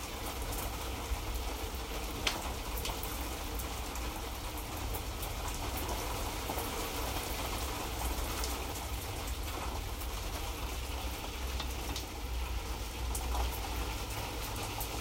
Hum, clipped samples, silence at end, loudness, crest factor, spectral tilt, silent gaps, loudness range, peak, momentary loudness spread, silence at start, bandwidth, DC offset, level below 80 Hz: none; under 0.1%; 0 s; -38 LUFS; 24 dB; -3.5 dB/octave; none; 2 LU; -12 dBFS; 3 LU; 0 s; 16.5 kHz; under 0.1%; -40 dBFS